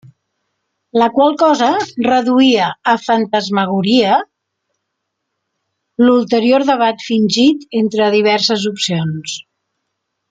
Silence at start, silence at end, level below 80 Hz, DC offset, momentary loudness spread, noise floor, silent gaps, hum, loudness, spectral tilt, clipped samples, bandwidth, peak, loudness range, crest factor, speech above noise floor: 0.95 s; 0.9 s; -60 dBFS; under 0.1%; 7 LU; -74 dBFS; none; none; -14 LUFS; -5 dB/octave; under 0.1%; 9.2 kHz; 0 dBFS; 3 LU; 14 dB; 61 dB